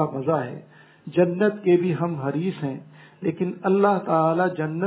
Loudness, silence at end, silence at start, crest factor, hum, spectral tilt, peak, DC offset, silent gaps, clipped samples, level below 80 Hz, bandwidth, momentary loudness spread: -23 LUFS; 0 s; 0 s; 18 dB; none; -12 dB/octave; -6 dBFS; under 0.1%; none; under 0.1%; -70 dBFS; 4 kHz; 12 LU